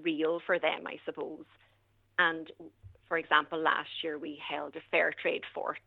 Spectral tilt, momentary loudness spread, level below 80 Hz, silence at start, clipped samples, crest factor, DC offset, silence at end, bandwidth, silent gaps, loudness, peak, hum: -6 dB/octave; 14 LU; -74 dBFS; 0 s; under 0.1%; 24 dB; under 0.1%; 0.1 s; 6.8 kHz; none; -32 LUFS; -10 dBFS; none